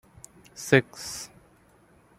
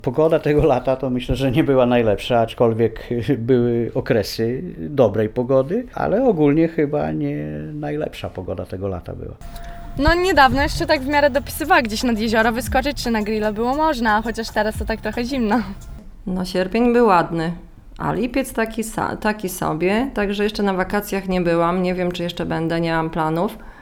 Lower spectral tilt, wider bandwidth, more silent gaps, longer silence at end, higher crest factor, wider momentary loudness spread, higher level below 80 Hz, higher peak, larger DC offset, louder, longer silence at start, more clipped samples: second, -4.5 dB/octave vs -6 dB/octave; second, 16 kHz vs over 20 kHz; neither; first, 0.95 s vs 0 s; first, 28 dB vs 18 dB; first, 21 LU vs 11 LU; second, -62 dBFS vs -36 dBFS; about the same, -2 dBFS vs 0 dBFS; neither; second, -26 LUFS vs -19 LUFS; first, 0.55 s vs 0.05 s; neither